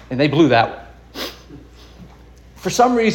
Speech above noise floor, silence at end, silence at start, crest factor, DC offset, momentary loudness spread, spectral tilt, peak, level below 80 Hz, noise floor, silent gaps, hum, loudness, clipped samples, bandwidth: 28 dB; 0 s; 0.1 s; 18 dB; under 0.1%; 18 LU; -5 dB/octave; -2 dBFS; -46 dBFS; -43 dBFS; none; none; -17 LUFS; under 0.1%; 17 kHz